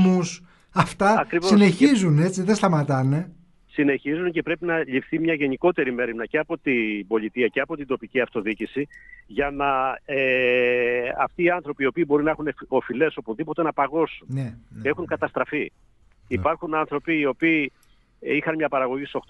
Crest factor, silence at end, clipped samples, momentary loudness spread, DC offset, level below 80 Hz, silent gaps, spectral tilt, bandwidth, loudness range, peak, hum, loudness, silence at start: 20 dB; 0.1 s; under 0.1%; 10 LU; under 0.1%; -54 dBFS; none; -6.5 dB/octave; 11.5 kHz; 6 LU; -4 dBFS; none; -23 LUFS; 0 s